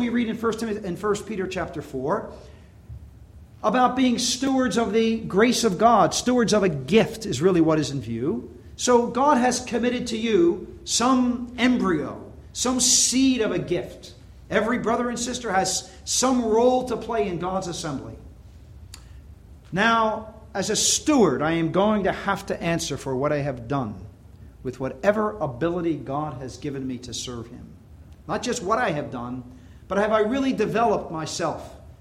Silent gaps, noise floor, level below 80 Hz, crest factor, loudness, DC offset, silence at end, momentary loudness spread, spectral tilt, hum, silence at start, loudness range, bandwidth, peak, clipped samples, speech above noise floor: none; -46 dBFS; -48 dBFS; 18 dB; -23 LUFS; under 0.1%; 0.1 s; 13 LU; -4 dB/octave; none; 0 s; 8 LU; 15.5 kHz; -6 dBFS; under 0.1%; 23 dB